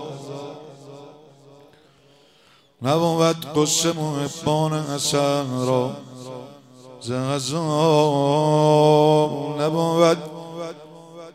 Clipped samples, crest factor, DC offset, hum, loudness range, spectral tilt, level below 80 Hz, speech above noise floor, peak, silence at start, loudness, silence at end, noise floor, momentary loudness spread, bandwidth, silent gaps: under 0.1%; 18 dB; under 0.1%; none; 6 LU; -5 dB/octave; -64 dBFS; 36 dB; -4 dBFS; 0 s; -20 LUFS; 0.05 s; -56 dBFS; 20 LU; 16 kHz; none